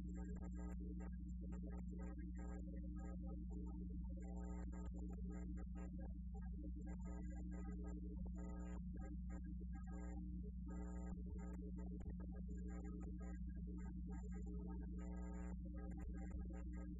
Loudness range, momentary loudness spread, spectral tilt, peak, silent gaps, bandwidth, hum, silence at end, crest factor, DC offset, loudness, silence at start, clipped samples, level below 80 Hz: 0 LU; 1 LU; -11 dB/octave; -40 dBFS; none; 7.4 kHz; none; 0 s; 10 dB; under 0.1%; -52 LUFS; 0 s; under 0.1%; -52 dBFS